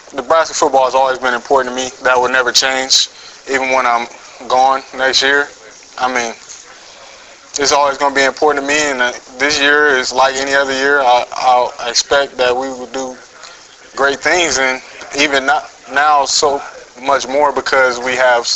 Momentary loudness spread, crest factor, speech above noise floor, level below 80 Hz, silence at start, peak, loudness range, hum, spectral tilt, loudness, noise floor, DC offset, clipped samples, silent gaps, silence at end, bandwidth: 12 LU; 14 dB; 24 dB; -50 dBFS; 0.1 s; 0 dBFS; 4 LU; none; -0.5 dB/octave; -13 LUFS; -38 dBFS; under 0.1%; under 0.1%; none; 0 s; 16 kHz